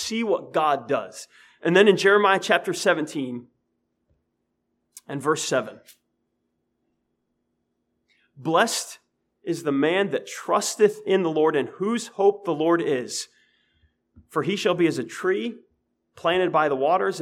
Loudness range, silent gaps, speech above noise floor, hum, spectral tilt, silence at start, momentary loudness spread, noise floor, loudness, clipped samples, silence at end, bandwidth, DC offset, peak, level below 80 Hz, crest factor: 10 LU; none; 53 dB; none; -4 dB/octave; 0 s; 13 LU; -76 dBFS; -23 LUFS; under 0.1%; 0 s; 15.5 kHz; under 0.1%; -4 dBFS; -72 dBFS; 20 dB